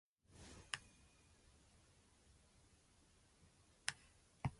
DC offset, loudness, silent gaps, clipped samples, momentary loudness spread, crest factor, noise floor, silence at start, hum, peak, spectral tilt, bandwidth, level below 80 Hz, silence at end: under 0.1%; -50 LUFS; none; under 0.1%; 21 LU; 40 dB; -72 dBFS; 0.3 s; none; -16 dBFS; -3 dB/octave; 11.5 kHz; -70 dBFS; 0 s